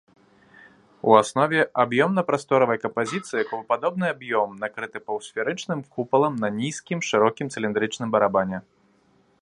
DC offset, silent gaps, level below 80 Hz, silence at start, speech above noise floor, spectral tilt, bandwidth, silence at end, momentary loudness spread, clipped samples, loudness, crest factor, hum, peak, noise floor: under 0.1%; none; -66 dBFS; 1.05 s; 39 dB; -5 dB/octave; 11.5 kHz; 0.8 s; 10 LU; under 0.1%; -23 LUFS; 22 dB; none; -2 dBFS; -62 dBFS